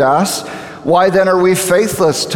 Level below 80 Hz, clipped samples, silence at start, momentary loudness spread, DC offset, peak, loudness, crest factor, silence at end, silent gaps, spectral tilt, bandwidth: -50 dBFS; under 0.1%; 0 s; 10 LU; under 0.1%; 0 dBFS; -12 LUFS; 12 dB; 0 s; none; -4 dB/octave; 19.5 kHz